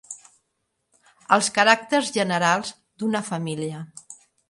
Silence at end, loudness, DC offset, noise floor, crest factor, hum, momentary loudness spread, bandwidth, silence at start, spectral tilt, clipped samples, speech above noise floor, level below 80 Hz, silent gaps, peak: 0.35 s; -22 LUFS; under 0.1%; -76 dBFS; 24 dB; none; 22 LU; 11.5 kHz; 0.1 s; -3.5 dB/octave; under 0.1%; 54 dB; -70 dBFS; none; -2 dBFS